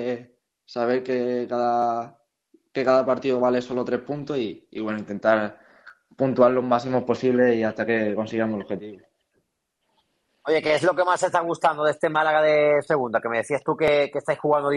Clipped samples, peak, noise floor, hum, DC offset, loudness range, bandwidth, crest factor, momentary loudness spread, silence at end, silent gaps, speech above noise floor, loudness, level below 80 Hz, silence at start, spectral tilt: under 0.1%; -4 dBFS; -75 dBFS; none; under 0.1%; 4 LU; 11.5 kHz; 20 dB; 11 LU; 0 s; none; 53 dB; -23 LUFS; -64 dBFS; 0 s; -6 dB/octave